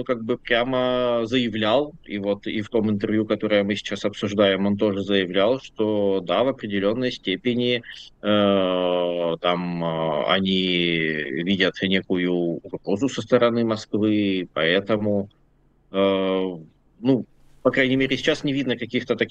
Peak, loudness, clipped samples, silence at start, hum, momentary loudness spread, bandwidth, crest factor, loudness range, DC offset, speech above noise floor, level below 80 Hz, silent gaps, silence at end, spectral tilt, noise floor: -4 dBFS; -22 LUFS; under 0.1%; 0 s; none; 6 LU; 8.4 kHz; 18 dB; 2 LU; under 0.1%; 37 dB; -56 dBFS; none; 0 s; -6 dB/octave; -59 dBFS